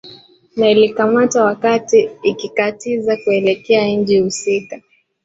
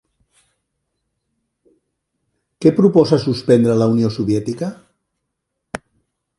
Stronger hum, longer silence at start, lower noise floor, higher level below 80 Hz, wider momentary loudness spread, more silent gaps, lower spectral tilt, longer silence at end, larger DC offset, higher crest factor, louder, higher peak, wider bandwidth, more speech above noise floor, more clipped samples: neither; second, 0.05 s vs 2.6 s; second, -42 dBFS vs -76 dBFS; about the same, -58 dBFS vs -54 dBFS; second, 7 LU vs 20 LU; neither; second, -4.5 dB/octave vs -7.5 dB/octave; second, 0.45 s vs 0.6 s; neither; about the same, 14 dB vs 18 dB; about the same, -15 LUFS vs -16 LUFS; about the same, -2 dBFS vs 0 dBFS; second, 8 kHz vs 11.5 kHz; second, 28 dB vs 62 dB; neither